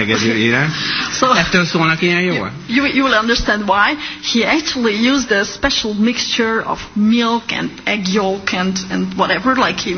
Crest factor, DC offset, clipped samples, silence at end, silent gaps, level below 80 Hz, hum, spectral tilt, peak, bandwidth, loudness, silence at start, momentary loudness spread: 16 dB; under 0.1%; under 0.1%; 0 s; none; -40 dBFS; none; -4 dB/octave; 0 dBFS; 6.6 kHz; -15 LUFS; 0 s; 5 LU